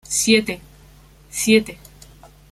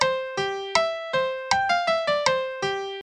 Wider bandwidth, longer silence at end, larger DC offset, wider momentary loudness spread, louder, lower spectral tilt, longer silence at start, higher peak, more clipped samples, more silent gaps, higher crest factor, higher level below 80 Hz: first, 15 kHz vs 11 kHz; first, 0.8 s vs 0 s; neither; first, 17 LU vs 6 LU; first, -18 LUFS vs -24 LUFS; about the same, -2.5 dB/octave vs -2 dB/octave; about the same, 0.1 s vs 0 s; about the same, -2 dBFS vs -4 dBFS; neither; neither; about the same, 20 dB vs 22 dB; first, -50 dBFS vs -58 dBFS